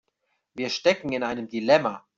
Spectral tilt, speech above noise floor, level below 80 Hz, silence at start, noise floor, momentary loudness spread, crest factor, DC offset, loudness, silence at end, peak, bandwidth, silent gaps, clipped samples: -4.5 dB/octave; 51 dB; -66 dBFS; 0.55 s; -75 dBFS; 10 LU; 22 dB; under 0.1%; -24 LUFS; 0.2 s; -4 dBFS; 7.6 kHz; none; under 0.1%